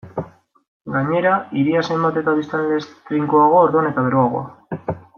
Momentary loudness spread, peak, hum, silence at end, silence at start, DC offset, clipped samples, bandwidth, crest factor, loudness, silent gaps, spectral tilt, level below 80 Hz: 15 LU; -2 dBFS; none; 0.2 s; 0.05 s; under 0.1%; under 0.1%; 6.8 kHz; 16 dB; -18 LUFS; 0.68-0.85 s; -8 dB/octave; -58 dBFS